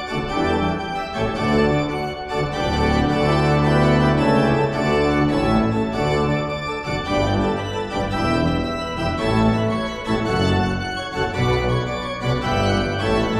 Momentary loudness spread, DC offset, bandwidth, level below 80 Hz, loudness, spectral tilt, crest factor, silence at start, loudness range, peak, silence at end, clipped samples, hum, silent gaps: 8 LU; under 0.1%; 12.5 kHz; -34 dBFS; -20 LUFS; -6.5 dB/octave; 14 dB; 0 s; 3 LU; -6 dBFS; 0 s; under 0.1%; none; none